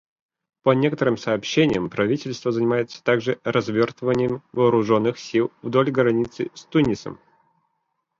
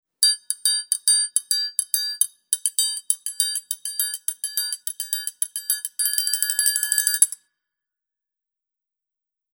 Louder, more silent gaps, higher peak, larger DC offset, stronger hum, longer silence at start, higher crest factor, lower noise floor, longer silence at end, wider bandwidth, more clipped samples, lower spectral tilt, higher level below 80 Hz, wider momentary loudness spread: about the same, -22 LUFS vs -21 LUFS; neither; second, -4 dBFS vs 0 dBFS; neither; neither; first, 0.65 s vs 0.2 s; second, 18 dB vs 24 dB; second, -75 dBFS vs -87 dBFS; second, 1.05 s vs 2.2 s; second, 7.6 kHz vs over 20 kHz; neither; first, -6.5 dB/octave vs 8.5 dB/octave; first, -56 dBFS vs under -90 dBFS; second, 5 LU vs 8 LU